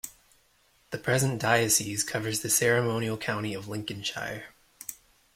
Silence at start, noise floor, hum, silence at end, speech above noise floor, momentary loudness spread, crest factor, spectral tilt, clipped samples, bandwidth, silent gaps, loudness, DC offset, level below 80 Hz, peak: 0.05 s; -65 dBFS; none; 0.4 s; 37 dB; 18 LU; 22 dB; -3 dB/octave; under 0.1%; 16.5 kHz; none; -27 LUFS; under 0.1%; -62 dBFS; -8 dBFS